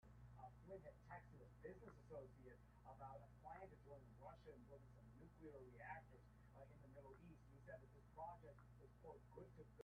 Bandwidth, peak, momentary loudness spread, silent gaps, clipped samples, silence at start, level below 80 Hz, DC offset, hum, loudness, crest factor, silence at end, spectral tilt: 6.6 kHz; -42 dBFS; 8 LU; none; under 0.1%; 0 s; -72 dBFS; under 0.1%; 60 Hz at -70 dBFS; -63 LUFS; 20 dB; 0 s; -7 dB/octave